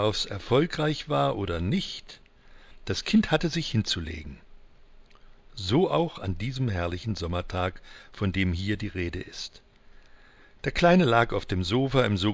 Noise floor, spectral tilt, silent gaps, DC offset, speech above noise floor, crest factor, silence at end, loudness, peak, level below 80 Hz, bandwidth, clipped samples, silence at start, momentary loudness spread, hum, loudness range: -53 dBFS; -6 dB/octave; none; under 0.1%; 27 dB; 20 dB; 0 s; -27 LUFS; -8 dBFS; -42 dBFS; 8 kHz; under 0.1%; 0 s; 15 LU; none; 5 LU